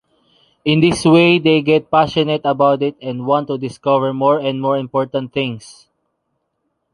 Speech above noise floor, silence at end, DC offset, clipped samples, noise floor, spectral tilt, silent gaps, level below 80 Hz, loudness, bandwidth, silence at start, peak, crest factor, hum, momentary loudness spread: 56 dB; 1.2 s; under 0.1%; under 0.1%; -71 dBFS; -6 dB/octave; none; -52 dBFS; -16 LUFS; 11 kHz; 0.65 s; -2 dBFS; 16 dB; none; 10 LU